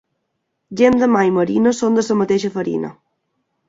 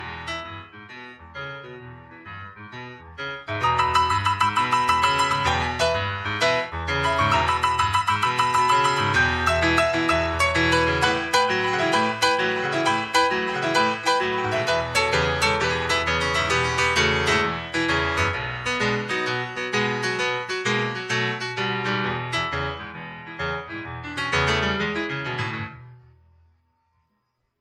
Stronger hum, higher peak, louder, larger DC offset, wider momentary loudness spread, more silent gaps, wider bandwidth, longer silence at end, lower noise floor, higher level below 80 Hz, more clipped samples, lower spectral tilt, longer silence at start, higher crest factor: neither; first, -2 dBFS vs -6 dBFS; first, -16 LUFS vs -22 LUFS; neither; second, 10 LU vs 16 LU; neither; second, 7.8 kHz vs 14.5 kHz; second, 0.75 s vs 1.65 s; about the same, -73 dBFS vs -73 dBFS; second, -54 dBFS vs -44 dBFS; neither; first, -6 dB/octave vs -4 dB/octave; first, 0.7 s vs 0 s; about the same, 16 dB vs 18 dB